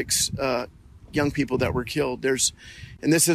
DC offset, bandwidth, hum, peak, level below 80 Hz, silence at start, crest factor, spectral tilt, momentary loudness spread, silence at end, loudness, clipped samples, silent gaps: under 0.1%; 14.5 kHz; none; -6 dBFS; -46 dBFS; 0 s; 20 dB; -3.5 dB/octave; 10 LU; 0 s; -24 LUFS; under 0.1%; none